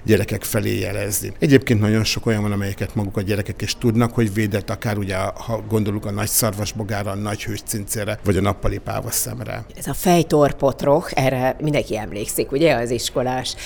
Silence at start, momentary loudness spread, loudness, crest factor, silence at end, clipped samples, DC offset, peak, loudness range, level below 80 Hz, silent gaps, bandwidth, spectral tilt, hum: 0 s; 8 LU; -21 LUFS; 20 dB; 0 s; under 0.1%; under 0.1%; 0 dBFS; 3 LU; -38 dBFS; none; over 20 kHz; -5 dB/octave; none